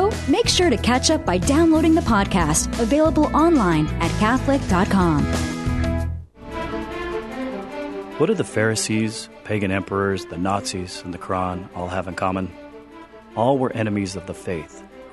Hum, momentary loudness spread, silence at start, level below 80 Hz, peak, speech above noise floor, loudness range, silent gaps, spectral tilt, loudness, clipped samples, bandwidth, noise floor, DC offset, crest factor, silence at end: none; 14 LU; 0 s; -34 dBFS; -4 dBFS; 22 dB; 8 LU; none; -5 dB/octave; -21 LUFS; under 0.1%; 12.5 kHz; -42 dBFS; under 0.1%; 16 dB; 0 s